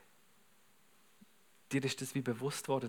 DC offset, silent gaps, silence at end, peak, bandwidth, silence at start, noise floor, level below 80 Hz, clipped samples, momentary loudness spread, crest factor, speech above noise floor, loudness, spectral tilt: under 0.1%; none; 0 s; -22 dBFS; 19.5 kHz; 1.7 s; -70 dBFS; under -90 dBFS; under 0.1%; 3 LU; 20 dB; 33 dB; -38 LUFS; -5 dB/octave